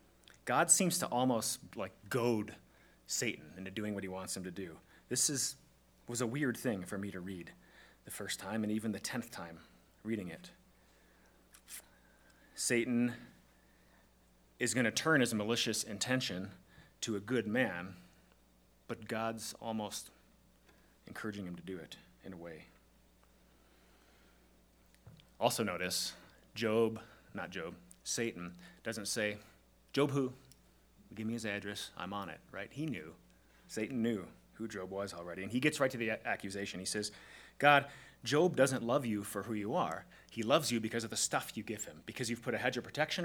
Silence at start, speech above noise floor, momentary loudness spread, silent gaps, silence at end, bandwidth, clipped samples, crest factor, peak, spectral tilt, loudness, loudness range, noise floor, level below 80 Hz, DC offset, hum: 0.45 s; 31 dB; 18 LU; none; 0 s; over 20 kHz; under 0.1%; 28 dB; -10 dBFS; -3.5 dB/octave; -36 LUFS; 11 LU; -67 dBFS; -70 dBFS; under 0.1%; none